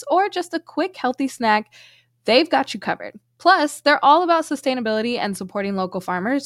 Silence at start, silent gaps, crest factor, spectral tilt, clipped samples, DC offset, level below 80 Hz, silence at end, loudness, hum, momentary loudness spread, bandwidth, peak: 0 s; none; 18 dB; -4 dB/octave; under 0.1%; under 0.1%; -68 dBFS; 0 s; -20 LUFS; none; 10 LU; 15.5 kHz; -2 dBFS